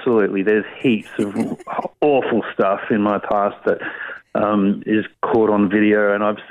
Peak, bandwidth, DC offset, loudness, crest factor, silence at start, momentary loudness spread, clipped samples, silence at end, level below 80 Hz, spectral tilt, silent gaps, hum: -6 dBFS; 11 kHz; under 0.1%; -19 LUFS; 12 dB; 0 s; 8 LU; under 0.1%; 0.05 s; -58 dBFS; -7.5 dB/octave; none; none